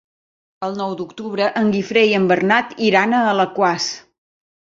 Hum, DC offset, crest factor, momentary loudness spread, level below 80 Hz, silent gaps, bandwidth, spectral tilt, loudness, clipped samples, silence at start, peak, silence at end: none; under 0.1%; 18 dB; 12 LU; -62 dBFS; none; 7.6 kHz; -4.5 dB/octave; -17 LUFS; under 0.1%; 0.6 s; 0 dBFS; 0.8 s